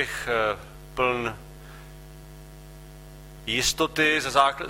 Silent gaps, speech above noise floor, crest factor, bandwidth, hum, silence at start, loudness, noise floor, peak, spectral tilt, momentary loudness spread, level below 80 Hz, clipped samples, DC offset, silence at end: none; 19 dB; 22 dB; 16 kHz; none; 0 s; -24 LUFS; -44 dBFS; -6 dBFS; -2.5 dB/octave; 25 LU; -46 dBFS; under 0.1%; under 0.1%; 0 s